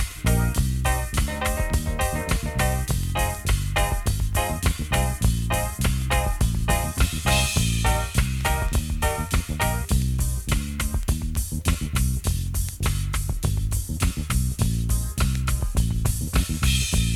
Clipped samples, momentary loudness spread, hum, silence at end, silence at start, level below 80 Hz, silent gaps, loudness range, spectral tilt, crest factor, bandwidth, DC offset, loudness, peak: under 0.1%; 4 LU; none; 0 s; 0 s; -26 dBFS; none; 3 LU; -4.5 dB/octave; 18 dB; 18 kHz; under 0.1%; -24 LUFS; -6 dBFS